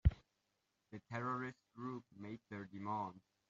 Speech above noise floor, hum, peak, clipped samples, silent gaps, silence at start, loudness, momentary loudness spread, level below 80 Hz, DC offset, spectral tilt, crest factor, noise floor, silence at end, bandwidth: 39 dB; none; -18 dBFS; under 0.1%; none; 0.05 s; -46 LUFS; 12 LU; -50 dBFS; under 0.1%; -7.5 dB/octave; 26 dB; -85 dBFS; 0.3 s; 7.4 kHz